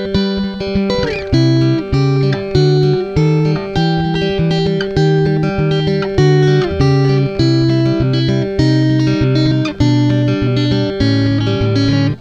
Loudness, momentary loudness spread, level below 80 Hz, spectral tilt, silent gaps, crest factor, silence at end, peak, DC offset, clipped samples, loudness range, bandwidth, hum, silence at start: -14 LUFS; 4 LU; -32 dBFS; -7.5 dB/octave; none; 12 dB; 0 s; 0 dBFS; under 0.1%; under 0.1%; 1 LU; 7.4 kHz; none; 0 s